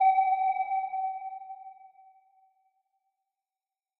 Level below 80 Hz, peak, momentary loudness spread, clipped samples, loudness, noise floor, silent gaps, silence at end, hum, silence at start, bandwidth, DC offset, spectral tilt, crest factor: under -90 dBFS; -16 dBFS; 21 LU; under 0.1%; -29 LUFS; under -90 dBFS; none; 2.1 s; none; 0 s; 4.1 kHz; under 0.1%; 2.5 dB/octave; 16 dB